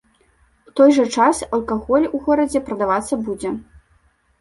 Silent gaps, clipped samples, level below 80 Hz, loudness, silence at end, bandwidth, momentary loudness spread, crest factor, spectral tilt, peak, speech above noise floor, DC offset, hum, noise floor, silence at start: none; under 0.1%; -48 dBFS; -18 LUFS; 0.8 s; 11.5 kHz; 12 LU; 16 dB; -4.5 dB/octave; -2 dBFS; 41 dB; under 0.1%; none; -59 dBFS; 0.75 s